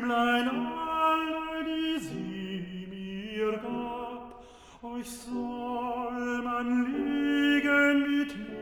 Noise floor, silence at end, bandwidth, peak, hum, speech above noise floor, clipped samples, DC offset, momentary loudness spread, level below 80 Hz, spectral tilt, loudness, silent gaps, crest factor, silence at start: -51 dBFS; 0 s; over 20 kHz; -14 dBFS; none; 21 dB; under 0.1%; under 0.1%; 15 LU; -58 dBFS; -5 dB/octave; -30 LUFS; none; 16 dB; 0 s